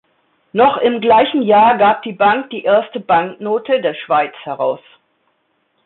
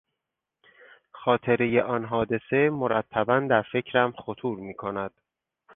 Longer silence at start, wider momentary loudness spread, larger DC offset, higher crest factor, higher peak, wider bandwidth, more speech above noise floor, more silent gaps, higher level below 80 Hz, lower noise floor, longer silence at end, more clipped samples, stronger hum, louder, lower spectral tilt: second, 0.55 s vs 1.15 s; about the same, 10 LU vs 10 LU; neither; second, 14 dB vs 20 dB; first, -2 dBFS vs -6 dBFS; first, 4.2 kHz vs 3.8 kHz; second, 50 dB vs 60 dB; neither; about the same, -58 dBFS vs -60 dBFS; second, -64 dBFS vs -85 dBFS; first, 1.1 s vs 0.65 s; neither; neither; first, -14 LUFS vs -26 LUFS; about the same, -10 dB/octave vs -10 dB/octave